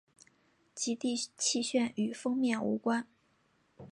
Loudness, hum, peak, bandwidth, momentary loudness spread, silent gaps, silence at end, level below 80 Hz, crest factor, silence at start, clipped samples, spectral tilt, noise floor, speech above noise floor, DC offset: -33 LUFS; none; -18 dBFS; 11.5 kHz; 6 LU; none; 0 s; -78 dBFS; 16 dB; 0.75 s; under 0.1%; -3 dB/octave; -72 dBFS; 39 dB; under 0.1%